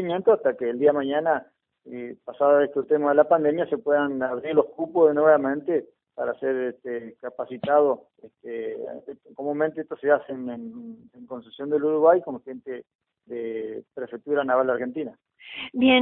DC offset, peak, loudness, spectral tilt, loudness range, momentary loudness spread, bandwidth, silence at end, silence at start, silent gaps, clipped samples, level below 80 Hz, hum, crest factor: under 0.1%; -4 dBFS; -23 LUFS; -9.5 dB/octave; 7 LU; 19 LU; 4 kHz; 0 s; 0 s; 12.95-12.99 s; under 0.1%; -68 dBFS; none; 20 dB